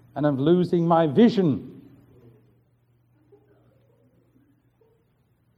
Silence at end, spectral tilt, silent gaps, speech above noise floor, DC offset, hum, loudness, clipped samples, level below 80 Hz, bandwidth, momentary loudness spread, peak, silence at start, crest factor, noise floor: 3.85 s; -9 dB/octave; none; 46 dB; under 0.1%; none; -21 LUFS; under 0.1%; -64 dBFS; 7 kHz; 10 LU; -8 dBFS; 0.15 s; 18 dB; -65 dBFS